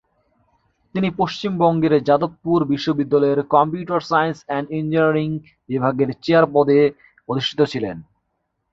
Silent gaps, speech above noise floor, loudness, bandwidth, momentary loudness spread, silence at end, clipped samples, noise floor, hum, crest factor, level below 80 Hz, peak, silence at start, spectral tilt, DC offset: none; 55 dB; -19 LUFS; 7.6 kHz; 11 LU; 0.7 s; under 0.1%; -73 dBFS; none; 18 dB; -56 dBFS; -2 dBFS; 0.95 s; -7.5 dB/octave; under 0.1%